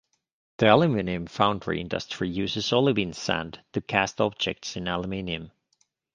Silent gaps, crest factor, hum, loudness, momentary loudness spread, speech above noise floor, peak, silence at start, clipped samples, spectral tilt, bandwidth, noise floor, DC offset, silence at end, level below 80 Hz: none; 24 dB; none; -26 LUFS; 11 LU; 45 dB; -2 dBFS; 0.6 s; under 0.1%; -5 dB/octave; 9.6 kHz; -71 dBFS; under 0.1%; 0.65 s; -52 dBFS